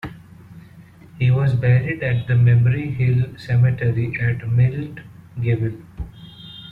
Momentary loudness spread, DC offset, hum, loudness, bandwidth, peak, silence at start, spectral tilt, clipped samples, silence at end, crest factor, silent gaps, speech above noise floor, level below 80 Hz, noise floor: 19 LU; under 0.1%; none; -19 LUFS; 4.4 kHz; -6 dBFS; 0.05 s; -9.5 dB/octave; under 0.1%; 0 s; 14 dB; none; 27 dB; -44 dBFS; -44 dBFS